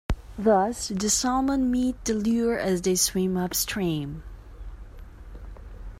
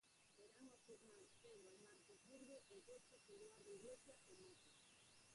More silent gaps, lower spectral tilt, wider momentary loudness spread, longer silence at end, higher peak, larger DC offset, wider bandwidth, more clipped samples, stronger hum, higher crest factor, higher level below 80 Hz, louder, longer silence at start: neither; about the same, -4 dB/octave vs -3 dB/octave; first, 22 LU vs 7 LU; about the same, 0 s vs 0 s; first, -10 dBFS vs -48 dBFS; neither; first, 16 kHz vs 11.5 kHz; neither; neither; about the same, 16 dB vs 16 dB; first, -40 dBFS vs under -90 dBFS; first, -25 LUFS vs -65 LUFS; about the same, 0.1 s vs 0.05 s